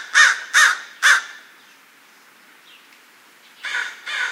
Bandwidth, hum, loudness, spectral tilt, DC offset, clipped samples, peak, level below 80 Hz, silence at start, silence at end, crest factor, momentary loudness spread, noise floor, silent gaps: 16.5 kHz; none; -16 LUFS; 5 dB/octave; under 0.1%; under 0.1%; 0 dBFS; under -90 dBFS; 0 s; 0 s; 22 dB; 14 LU; -50 dBFS; none